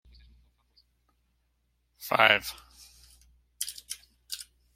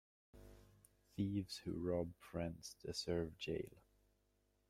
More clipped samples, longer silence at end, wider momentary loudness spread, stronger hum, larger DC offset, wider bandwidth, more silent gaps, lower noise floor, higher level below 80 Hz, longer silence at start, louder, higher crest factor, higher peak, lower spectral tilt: neither; second, 0.35 s vs 0.9 s; about the same, 21 LU vs 20 LU; about the same, 60 Hz at -65 dBFS vs 50 Hz at -65 dBFS; neither; about the same, 16.5 kHz vs 16 kHz; neither; second, -74 dBFS vs -80 dBFS; about the same, -62 dBFS vs -66 dBFS; first, 2 s vs 0.35 s; first, -27 LUFS vs -45 LUFS; first, 30 dB vs 18 dB; first, -2 dBFS vs -28 dBFS; second, -1.5 dB/octave vs -5.5 dB/octave